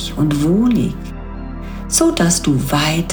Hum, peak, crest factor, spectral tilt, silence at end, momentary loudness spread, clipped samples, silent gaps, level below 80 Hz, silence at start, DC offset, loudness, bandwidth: none; -2 dBFS; 16 dB; -4.5 dB/octave; 0 s; 16 LU; under 0.1%; none; -30 dBFS; 0 s; under 0.1%; -15 LUFS; over 20 kHz